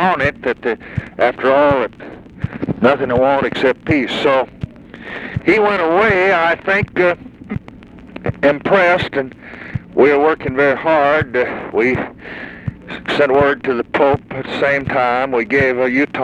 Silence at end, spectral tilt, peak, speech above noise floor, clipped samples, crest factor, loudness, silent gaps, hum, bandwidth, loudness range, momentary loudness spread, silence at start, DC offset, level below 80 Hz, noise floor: 0 s; -7 dB/octave; 0 dBFS; 23 dB; under 0.1%; 16 dB; -15 LUFS; none; none; 9.6 kHz; 2 LU; 15 LU; 0 s; under 0.1%; -42 dBFS; -38 dBFS